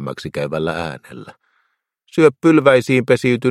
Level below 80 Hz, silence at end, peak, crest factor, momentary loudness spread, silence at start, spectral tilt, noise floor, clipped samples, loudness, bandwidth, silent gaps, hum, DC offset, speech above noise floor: -54 dBFS; 0 s; 0 dBFS; 16 dB; 15 LU; 0 s; -6.5 dB/octave; -68 dBFS; under 0.1%; -16 LUFS; 13 kHz; none; none; under 0.1%; 52 dB